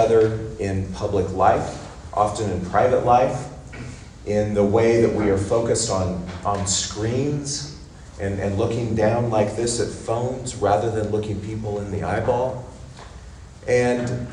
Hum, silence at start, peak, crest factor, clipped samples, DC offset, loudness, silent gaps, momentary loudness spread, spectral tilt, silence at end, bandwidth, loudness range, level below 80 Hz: none; 0 s; -4 dBFS; 18 dB; under 0.1%; under 0.1%; -22 LUFS; none; 18 LU; -5.5 dB/octave; 0 s; 11 kHz; 4 LU; -42 dBFS